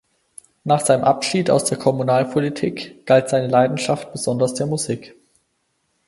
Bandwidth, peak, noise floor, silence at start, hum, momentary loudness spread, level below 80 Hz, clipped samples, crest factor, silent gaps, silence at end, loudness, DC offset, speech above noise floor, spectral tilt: 11.5 kHz; -2 dBFS; -69 dBFS; 0.65 s; none; 9 LU; -60 dBFS; under 0.1%; 18 dB; none; 1 s; -19 LUFS; under 0.1%; 51 dB; -5 dB/octave